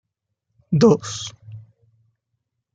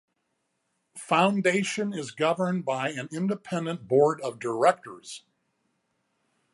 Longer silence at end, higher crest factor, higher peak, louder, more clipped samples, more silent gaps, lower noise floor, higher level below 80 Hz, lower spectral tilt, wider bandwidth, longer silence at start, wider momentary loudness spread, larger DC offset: second, 1.15 s vs 1.35 s; about the same, 20 dB vs 22 dB; about the same, -4 dBFS vs -6 dBFS; first, -19 LUFS vs -26 LUFS; neither; neither; about the same, -77 dBFS vs -77 dBFS; first, -62 dBFS vs -78 dBFS; first, -6.5 dB/octave vs -5 dB/octave; second, 9.2 kHz vs 11.5 kHz; second, 0.7 s vs 0.95 s; first, 26 LU vs 16 LU; neither